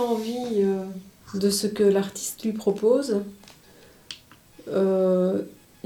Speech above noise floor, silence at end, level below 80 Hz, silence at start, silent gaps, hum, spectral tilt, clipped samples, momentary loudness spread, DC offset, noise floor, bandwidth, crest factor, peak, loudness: 29 dB; 0.35 s; -64 dBFS; 0 s; none; none; -5.5 dB/octave; under 0.1%; 20 LU; under 0.1%; -52 dBFS; 19 kHz; 16 dB; -10 dBFS; -24 LUFS